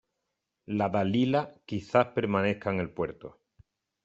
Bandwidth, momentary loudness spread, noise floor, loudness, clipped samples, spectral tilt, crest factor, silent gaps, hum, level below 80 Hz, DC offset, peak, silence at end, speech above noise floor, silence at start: 7.8 kHz; 11 LU; -83 dBFS; -29 LUFS; under 0.1%; -7.5 dB/octave; 22 dB; none; none; -64 dBFS; under 0.1%; -8 dBFS; 0.75 s; 55 dB; 0.7 s